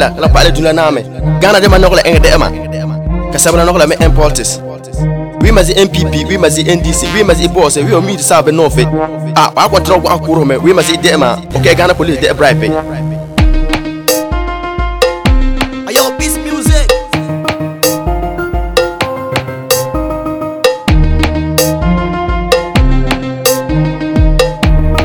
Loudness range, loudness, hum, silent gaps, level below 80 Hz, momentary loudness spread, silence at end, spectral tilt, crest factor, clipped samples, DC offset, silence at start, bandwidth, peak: 4 LU; -10 LUFS; none; none; -16 dBFS; 9 LU; 0 s; -4.5 dB/octave; 10 dB; 0.7%; under 0.1%; 0 s; 18.5 kHz; 0 dBFS